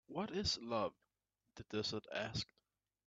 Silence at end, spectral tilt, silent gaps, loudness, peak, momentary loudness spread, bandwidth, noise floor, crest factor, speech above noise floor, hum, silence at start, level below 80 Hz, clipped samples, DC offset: 0.65 s; -4 dB/octave; none; -42 LUFS; -26 dBFS; 8 LU; 9 kHz; -88 dBFS; 18 dB; 46 dB; none; 0.1 s; -66 dBFS; under 0.1%; under 0.1%